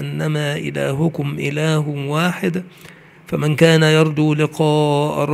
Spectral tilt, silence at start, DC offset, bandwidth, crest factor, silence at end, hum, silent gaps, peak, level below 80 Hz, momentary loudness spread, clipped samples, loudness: -6 dB/octave; 0 s; under 0.1%; 14.5 kHz; 18 dB; 0 s; none; none; 0 dBFS; -56 dBFS; 9 LU; under 0.1%; -17 LUFS